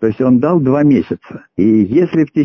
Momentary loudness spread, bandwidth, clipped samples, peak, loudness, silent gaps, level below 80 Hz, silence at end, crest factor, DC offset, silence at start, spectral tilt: 12 LU; 6.2 kHz; under 0.1%; -2 dBFS; -12 LUFS; none; -46 dBFS; 0 s; 10 dB; under 0.1%; 0 s; -10 dB/octave